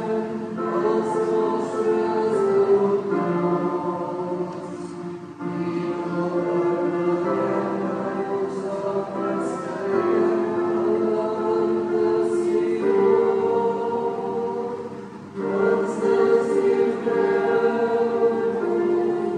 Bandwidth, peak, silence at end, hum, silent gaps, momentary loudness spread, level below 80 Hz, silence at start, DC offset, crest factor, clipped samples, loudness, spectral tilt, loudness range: 10 kHz; -8 dBFS; 0 s; none; none; 8 LU; -68 dBFS; 0 s; under 0.1%; 14 dB; under 0.1%; -23 LUFS; -7.5 dB/octave; 5 LU